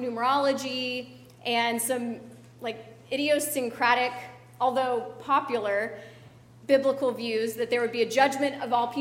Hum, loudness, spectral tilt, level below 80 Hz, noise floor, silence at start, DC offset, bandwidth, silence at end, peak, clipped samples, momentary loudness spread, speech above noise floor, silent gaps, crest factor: none; -27 LUFS; -3 dB/octave; -72 dBFS; -51 dBFS; 0 s; under 0.1%; 16 kHz; 0 s; -8 dBFS; under 0.1%; 13 LU; 24 dB; none; 20 dB